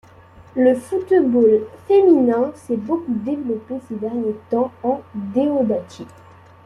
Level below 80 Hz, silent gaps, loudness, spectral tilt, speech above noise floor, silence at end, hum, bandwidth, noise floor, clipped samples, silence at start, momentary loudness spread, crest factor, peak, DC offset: -60 dBFS; none; -19 LUFS; -8 dB/octave; 27 dB; 0.6 s; none; 11.5 kHz; -45 dBFS; under 0.1%; 0.55 s; 13 LU; 16 dB; -4 dBFS; under 0.1%